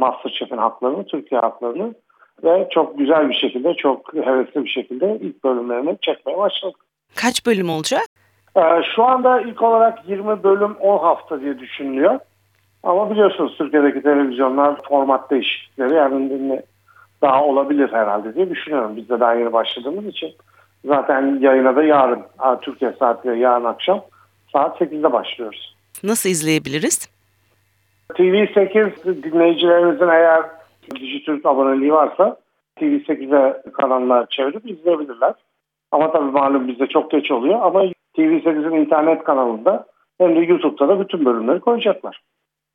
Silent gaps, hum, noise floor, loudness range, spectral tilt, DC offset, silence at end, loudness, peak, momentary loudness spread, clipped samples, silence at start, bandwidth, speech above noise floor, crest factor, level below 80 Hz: 8.06-8.16 s; none; -62 dBFS; 4 LU; -4.5 dB/octave; under 0.1%; 0.6 s; -17 LUFS; -2 dBFS; 11 LU; under 0.1%; 0 s; 17 kHz; 45 dB; 16 dB; -72 dBFS